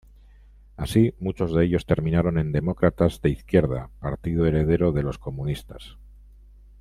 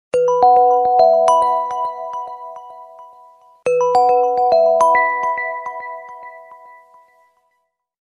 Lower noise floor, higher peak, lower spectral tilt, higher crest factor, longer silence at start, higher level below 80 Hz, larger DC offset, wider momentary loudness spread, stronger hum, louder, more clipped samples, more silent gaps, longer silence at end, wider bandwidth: second, -50 dBFS vs -70 dBFS; about the same, -4 dBFS vs -2 dBFS; first, -8 dB/octave vs -3 dB/octave; about the same, 20 dB vs 16 dB; first, 0.8 s vs 0.15 s; first, -40 dBFS vs -62 dBFS; neither; second, 10 LU vs 21 LU; first, 50 Hz at -40 dBFS vs none; second, -24 LUFS vs -15 LUFS; neither; neither; second, 0.75 s vs 1.45 s; first, 13.5 kHz vs 10.5 kHz